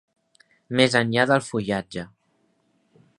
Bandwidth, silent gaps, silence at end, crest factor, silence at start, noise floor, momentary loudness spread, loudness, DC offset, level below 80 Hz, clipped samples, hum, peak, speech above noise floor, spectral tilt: 11.5 kHz; none; 1.1 s; 24 dB; 0.7 s; -68 dBFS; 16 LU; -22 LUFS; under 0.1%; -60 dBFS; under 0.1%; none; -2 dBFS; 46 dB; -5 dB/octave